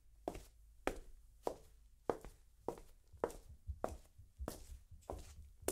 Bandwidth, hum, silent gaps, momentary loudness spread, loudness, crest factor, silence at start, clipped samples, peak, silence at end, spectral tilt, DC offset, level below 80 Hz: 16 kHz; none; none; 15 LU; -49 LUFS; 30 dB; 0.05 s; under 0.1%; -18 dBFS; 0 s; -5 dB/octave; under 0.1%; -58 dBFS